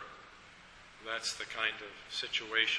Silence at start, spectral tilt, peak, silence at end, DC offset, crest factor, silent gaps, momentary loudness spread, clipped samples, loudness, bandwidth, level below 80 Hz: 0 s; 0 dB/octave; -14 dBFS; 0 s; under 0.1%; 24 dB; none; 22 LU; under 0.1%; -35 LUFS; 11 kHz; -70 dBFS